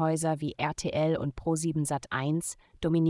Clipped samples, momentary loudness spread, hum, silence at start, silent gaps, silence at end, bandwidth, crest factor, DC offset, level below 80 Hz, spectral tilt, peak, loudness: under 0.1%; 4 LU; none; 0 s; none; 0 s; 12 kHz; 16 dB; under 0.1%; -54 dBFS; -5.5 dB/octave; -14 dBFS; -30 LUFS